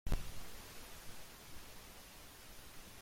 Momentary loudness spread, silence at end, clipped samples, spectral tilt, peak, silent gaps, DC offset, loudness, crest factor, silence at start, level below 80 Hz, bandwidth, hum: 8 LU; 0 s; under 0.1%; -3.5 dB/octave; -26 dBFS; none; under 0.1%; -52 LUFS; 18 dB; 0.05 s; -48 dBFS; 16.5 kHz; none